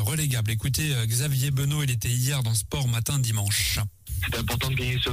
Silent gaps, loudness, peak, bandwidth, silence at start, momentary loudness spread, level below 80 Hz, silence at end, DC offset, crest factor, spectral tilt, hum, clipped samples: none; -25 LUFS; -12 dBFS; 16 kHz; 0 s; 3 LU; -40 dBFS; 0 s; under 0.1%; 12 dB; -4 dB/octave; none; under 0.1%